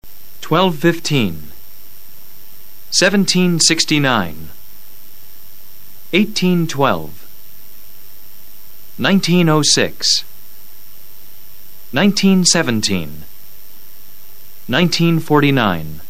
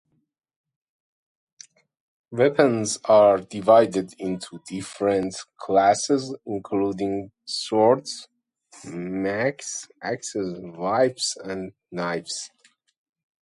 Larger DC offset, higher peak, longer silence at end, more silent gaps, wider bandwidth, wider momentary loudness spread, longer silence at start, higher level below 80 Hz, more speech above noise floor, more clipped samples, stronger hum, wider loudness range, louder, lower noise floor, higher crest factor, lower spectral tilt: first, 6% vs under 0.1%; first, 0 dBFS vs -4 dBFS; second, 0.1 s vs 0.95 s; neither; first, 16 kHz vs 11.5 kHz; about the same, 15 LU vs 17 LU; second, 0 s vs 2.3 s; first, -50 dBFS vs -64 dBFS; second, 27 dB vs 50 dB; neither; neither; second, 4 LU vs 7 LU; first, -14 LUFS vs -23 LUFS; second, -42 dBFS vs -72 dBFS; about the same, 18 dB vs 20 dB; about the same, -4 dB/octave vs -4.5 dB/octave